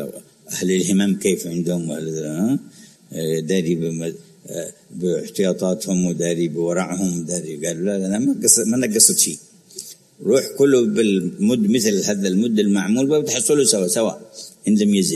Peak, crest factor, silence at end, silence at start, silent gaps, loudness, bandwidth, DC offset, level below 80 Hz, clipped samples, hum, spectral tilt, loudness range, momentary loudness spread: 0 dBFS; 20 dB; 0 s; 0 s; none; -19 LUFS; 13.5 kHz; under 0.1%; -62 dBFS; under 0.1%; none; -4 dB/octave; 7 LU; 16 LU